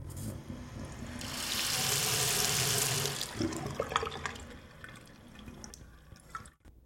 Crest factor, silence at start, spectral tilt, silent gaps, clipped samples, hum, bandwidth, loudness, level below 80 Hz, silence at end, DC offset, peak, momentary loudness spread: 26 dB; 0 s; -2 dB/octave; none; under 0.1%; none; 16.5 kHz; -31 LUFS; -54 dBFS; 0.05 s; under 0.1%; -10 dBFS; 22 LU